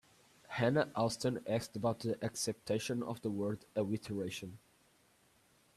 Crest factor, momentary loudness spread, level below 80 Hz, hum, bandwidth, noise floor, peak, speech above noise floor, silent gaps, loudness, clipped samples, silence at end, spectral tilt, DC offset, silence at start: 20 dB; 7 LU; -72 dBFS; none; 14.5 kHz; -70 dBFS; -18 dBFS; 33 dB; none; -37 LUFS; under 0.1%; 1.2 s; -5 dB/octave; under 0.1%; 0.5 s